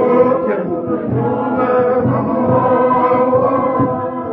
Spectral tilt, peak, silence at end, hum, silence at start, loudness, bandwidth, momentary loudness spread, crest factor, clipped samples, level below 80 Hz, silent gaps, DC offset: -11.5 dB/octave; -2 dBFS; 0 s; none; 0 s; -15 LUFS; 4 kHz; 6 LU; 12 dB; under 0.1%; -48 dBFS; none; under 0.1%